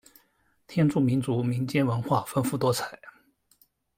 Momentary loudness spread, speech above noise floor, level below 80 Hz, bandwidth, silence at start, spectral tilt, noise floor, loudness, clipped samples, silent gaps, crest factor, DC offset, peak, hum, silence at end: 8 LU; 42 dB; -62 dBFS; 16.5 kHz; 0.7 s; -6.5 dB/octave; -68 dBFS; -27 LUFS; under 0.1%; none; 16 dB; under 0.1%; -12 dBFS; none; 0.9 s